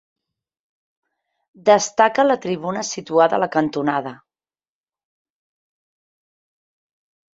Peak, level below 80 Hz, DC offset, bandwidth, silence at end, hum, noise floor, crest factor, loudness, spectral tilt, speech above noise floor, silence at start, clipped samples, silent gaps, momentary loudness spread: -2 dBFS; -68 dBFS; under 0.1%; 8 kHz; 3.25 s; none; under -90 dBFS; 22 dB; -19 LUFS; -4 dB/octave; over 72 dB; 1.65 s; under 0.1%; none; 9 LU